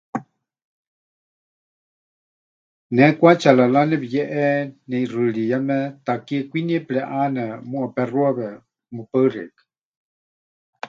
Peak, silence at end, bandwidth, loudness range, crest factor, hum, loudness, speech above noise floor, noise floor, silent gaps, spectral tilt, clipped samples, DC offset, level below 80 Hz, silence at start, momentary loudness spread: 0 dBFS; 0 s; 7.6 kHz; 7 LU; 22 dB; none; -20 LUFS; over 71 dB; under -90 dBFS; 0.65-2.90 s, 9.85-10.73 s; -7.5 dB/octave; under 0.1%; under 0.1%; -70 dBFS; 0.15 s; 14 LU